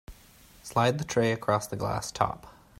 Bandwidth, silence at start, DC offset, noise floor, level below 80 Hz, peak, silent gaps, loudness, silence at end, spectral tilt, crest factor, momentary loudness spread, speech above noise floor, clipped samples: 16 kHz; 0.1 s; under 0.1%; -55 dBFS; -54 dBFS; -8 dBFS; none; -28 LUFS; 0.3 s; -5 dB/octave; 22 dB; 6 LU; 27 dB; under 0.1%